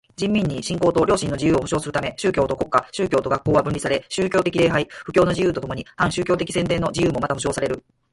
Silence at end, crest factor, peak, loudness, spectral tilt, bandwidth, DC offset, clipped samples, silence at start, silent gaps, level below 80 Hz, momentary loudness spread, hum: 0.35 s; 18 dB; -2 dBFS; -21 LUFS; -5.5 dB/octave; 11.5 kHz; under 0.1%; under 0.1%; 0.2 s; none; -44 dBFS; 5 LU; none